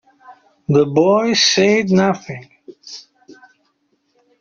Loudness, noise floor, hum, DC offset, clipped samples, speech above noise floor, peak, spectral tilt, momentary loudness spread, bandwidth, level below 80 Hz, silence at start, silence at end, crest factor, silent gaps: -14 LUFS; -65 dBFS; none; under 0.1%; under 0.1%; 50 dB; -2 dBFS; -4 dB/octave; 22 LU; 7.4 kHz; -58 dBFS; 0.3 s; 1.1 s; 16 dB; none